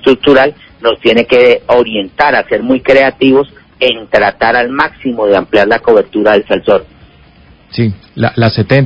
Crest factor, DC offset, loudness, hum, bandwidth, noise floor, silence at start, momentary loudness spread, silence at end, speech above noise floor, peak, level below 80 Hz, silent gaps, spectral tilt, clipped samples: 10 dB; under 0.1%; -10 LUFS; none; 8 kHz; -41 dBFS; 0.05 s; 8 LU; 0 s; 32 dB; 0 dBFS; -40 dBFS; none; -7.5 dB/octave; 1%